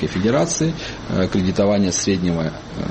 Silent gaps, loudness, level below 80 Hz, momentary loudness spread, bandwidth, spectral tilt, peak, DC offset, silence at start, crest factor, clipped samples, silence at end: none; -20 LUFS; -40 dBFS; 8 LU; 8.8 kHz; -5 dB/octave; -6 dBFS; under 0.1%; 0 s; 14 dB; under 0.1%; 0 s